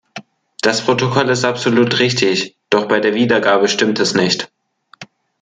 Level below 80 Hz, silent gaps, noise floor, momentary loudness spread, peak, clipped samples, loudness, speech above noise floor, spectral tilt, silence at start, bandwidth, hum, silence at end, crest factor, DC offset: -58 dBFS; none; -43 dBFS; 7 LU; 0 dBFS; under 0.1%; -15 LUFS; 29 dB; -4 dB/octave; 0.15 s; 9.6 kHz; none; 0.4 s; 16 dB; under 0.1%